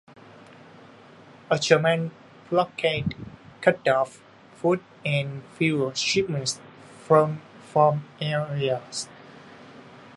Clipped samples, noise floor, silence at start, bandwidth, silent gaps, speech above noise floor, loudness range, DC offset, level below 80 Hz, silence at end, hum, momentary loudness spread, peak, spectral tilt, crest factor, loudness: under 0.1%; -49 dBFS; 1.5 s; 11.5 kHz; none; 26 dB; 2 LU; under 0.1%; -60 dBFS; 0.05 s; none; 14 LU; -2 dBFS; -5 dB/octave; 24 dB; -25 LUFS